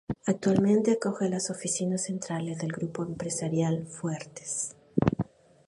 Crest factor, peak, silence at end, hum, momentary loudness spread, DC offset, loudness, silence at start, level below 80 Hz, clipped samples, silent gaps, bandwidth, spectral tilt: 20 dB; -8 dBFS; 0.45 s; none; 10 LU; under 0.1%; -29 LUFS; 0.1 s; -56 dBFS; under 0.1%; none; 11.5 kHz; -5.5 dB/octave